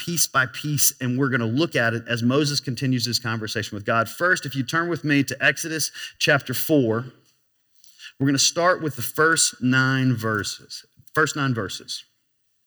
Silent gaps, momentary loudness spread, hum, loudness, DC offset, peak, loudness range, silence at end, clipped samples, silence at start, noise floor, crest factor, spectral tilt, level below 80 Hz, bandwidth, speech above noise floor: none; 9 LU; none; -22 LUFS; under 0.1%; -4 dBFS; 2 LU; 0.65 s; under 0.1%; 0 s; -64 dBFS; 18 dB; -3.5 dB/octave; -68 dBFS; over 20 kHz; 41 dB